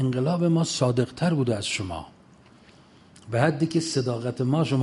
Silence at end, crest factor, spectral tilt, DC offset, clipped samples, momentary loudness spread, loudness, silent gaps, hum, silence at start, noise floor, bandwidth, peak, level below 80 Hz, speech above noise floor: 0 s; 20 dB; -6 dB/octave; under 0.1%; under 0.1%; 7 LU; -25 LUFS; none; none; 0 s; -53 dBFS; 11.5 kHz; -6 dBFS; -54 dBFS; 29 dB